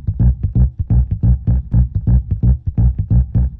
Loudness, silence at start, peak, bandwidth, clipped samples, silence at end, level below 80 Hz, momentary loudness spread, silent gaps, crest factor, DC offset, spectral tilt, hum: -16 LUFS; 0 s; -4 dBFS; 1.8 kHz; under 0.1%; 0.05 s; -16 dBFS; 2 LU; none; 10 dB; under 0.1%; -14.5 dB/octave; none